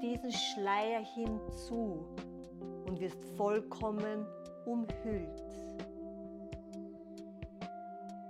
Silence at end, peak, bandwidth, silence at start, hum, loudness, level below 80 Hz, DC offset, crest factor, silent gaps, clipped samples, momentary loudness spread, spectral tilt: 0 s; -20 dBFS; 14 kHz; 0 s; none; -40 LUFS; -56 dBFS; under 0.1%; 20 dB; none; under 0.1%; 13 LU; -5 dB/octave